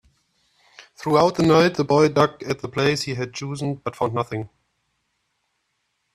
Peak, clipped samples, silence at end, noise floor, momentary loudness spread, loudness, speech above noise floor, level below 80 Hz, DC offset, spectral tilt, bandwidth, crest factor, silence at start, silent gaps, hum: -2 dBFS; under 0.1%; 1.7 s; -73 dBFS; 13 LU; -21 LUFS; 53 dB; -58 dBFS; under 0.1%; -6 dB/octave; 14 kHz; 20 dB; 0.8 s; none; none